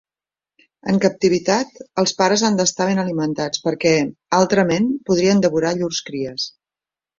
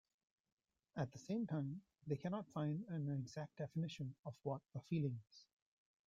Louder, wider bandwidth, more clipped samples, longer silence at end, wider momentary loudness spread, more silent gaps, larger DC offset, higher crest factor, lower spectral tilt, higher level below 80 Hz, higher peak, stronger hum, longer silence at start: first, -19 LUFS vs -46 LUFS; about the same, 7.8 kHz vs 7.6 kHz; neither; about the same, 0.7 s vs 0.65 s; about the same, 9 LU vs 9 LU; second, none vs 4.19-4.23 s; neither; about the same, 18 dB vs 18 dB; second, -4.5 dB/octave vs -7.5 dB/octave; first, -56 dBFS vs -82 dBFS; first, -2 dBFS vs -28 dBFS; neither; about the same, 0.85 s vs 0.95 s